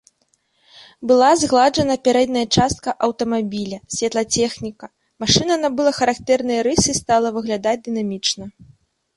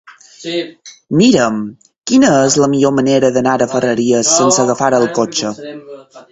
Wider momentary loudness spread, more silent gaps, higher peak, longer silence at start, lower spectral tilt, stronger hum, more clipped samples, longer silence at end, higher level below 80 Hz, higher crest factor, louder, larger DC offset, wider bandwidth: second, 11 LU vs 18 LU; neither; about the same, 0 dBFS vs 0 dBFS; first, 0.75 s vs 0.4 s; about the same, -3.5 dB/octave vs -4 dB/octave; neither; neither; first, 0.5 s vs 0.1 s; first, -46 dBFS vs -54 dBFS; about the same, 18 dB vs 14 dB; second, -18 LUFS vs -13 LUFS; neither; first, 11.5 kHz vs 8.4 kHz